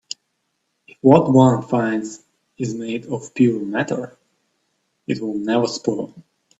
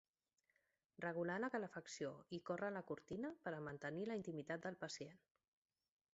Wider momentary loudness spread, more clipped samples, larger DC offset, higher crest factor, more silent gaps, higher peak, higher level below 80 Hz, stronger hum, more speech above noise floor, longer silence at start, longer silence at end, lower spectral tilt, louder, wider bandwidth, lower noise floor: first, 20 LU vs 7 LU; neither; neither; about the same, 20 dB vs 18 dB; neither; first, 0 dBFS vs -32 dBFS; first, -60 dBFS vs -82 dBFS; neither; first, 54 dB vs 40 dB; about the same, 1.05 s vs 1 s; second, 0.4 s vs 0.95 s; first, -6.5 dB/octave vs -5 dB/octave; first, -19 LUFS vs -48 LUFS; about the same, 8 kHz vs 7.6 kHz; second, -72 dBFS vs -88 dBFS